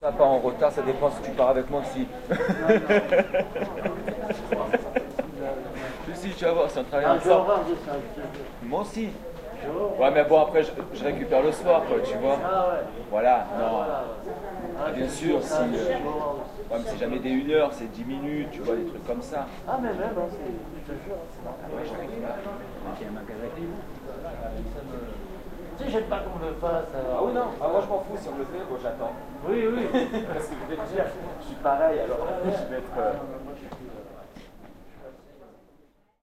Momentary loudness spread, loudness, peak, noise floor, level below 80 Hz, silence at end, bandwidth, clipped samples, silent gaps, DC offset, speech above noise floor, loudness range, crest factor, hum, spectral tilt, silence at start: 16 LU; -27 LUFS; -6 dBFS; -59 dBFS; -44 dBFS; 0.7 s; 15 kHz; under 0.1%; none; under 0.1%; 33 dB; 12 LU; 22 dB; none; -6 dB/octave; 0 s